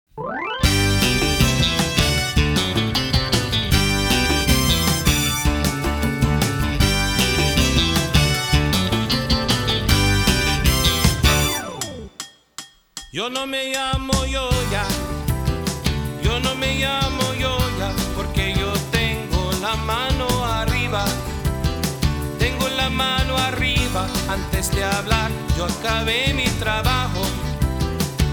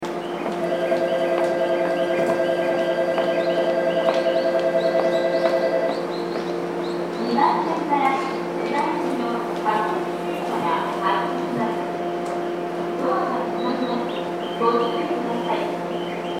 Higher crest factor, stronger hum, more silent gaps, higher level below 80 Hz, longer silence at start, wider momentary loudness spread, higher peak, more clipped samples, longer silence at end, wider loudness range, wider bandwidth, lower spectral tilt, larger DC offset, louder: about the same, 18 dB vs 18 dB; neither; neither; first, -26 dBFS vs -70 dBFS; first, 0.15 s vs 0 s; about the same, 7 LU vs 6 LU; about the same, -2 dBFS vs -4 dBFS; neither; about the same, 0 s vs 0 s; about the same, 4 LU vs 3 LU; first, over 20 kHz vs 15.5 kHz; second, -4 dB/octave vs -6 dB/octave; neither; first, -20 LUFS vs -23 LUFS